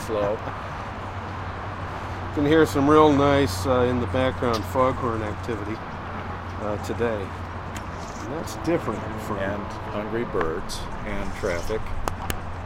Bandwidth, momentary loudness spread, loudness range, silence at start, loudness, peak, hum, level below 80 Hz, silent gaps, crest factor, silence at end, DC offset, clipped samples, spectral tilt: 16 kHz; 14 LU; 9 LU; 0 s; -25 LUFS; -2 dBFS; none; -40 dBFS; none; 22 dB; 0 s; under 0.1%; under 0.1%; -6 dB/octave